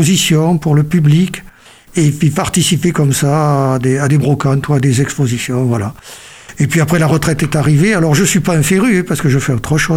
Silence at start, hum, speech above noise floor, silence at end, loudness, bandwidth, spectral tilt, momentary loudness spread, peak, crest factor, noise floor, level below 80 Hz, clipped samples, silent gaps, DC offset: 0 s; none; 27 dB; 0 s; -12 LUFS; 16 kHz; -5.5 dB/octave; 7 LU; -2 dBFS; 10 dB; -39 dBFS; -38 dBFS; under 0.1%; none; under 0.1%